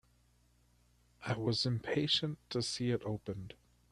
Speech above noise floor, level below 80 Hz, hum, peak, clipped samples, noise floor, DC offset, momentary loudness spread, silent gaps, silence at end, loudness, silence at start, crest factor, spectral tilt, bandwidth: 34 dB; -66 dBFS; 60 Hz at -55 dBFS; -18 dBFS; under 0.1%; -70 dBFS; under 0.1%; 14 LU; none; 0.4 s; -35 LUFS; 1.2 s; 20 dB; -5 dB/octave; 12 kHz